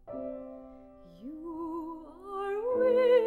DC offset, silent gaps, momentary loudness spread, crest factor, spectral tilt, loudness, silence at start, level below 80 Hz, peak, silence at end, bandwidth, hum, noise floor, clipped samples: under 0.1%; none; 22 LU; 16 dB; -6.5 dB/octave; -31 LUFS; 0.05 s; -62 dBFS; -14 dBFS; 0 s; 4.3 kHz; none; -52 dBFS; under 0.1%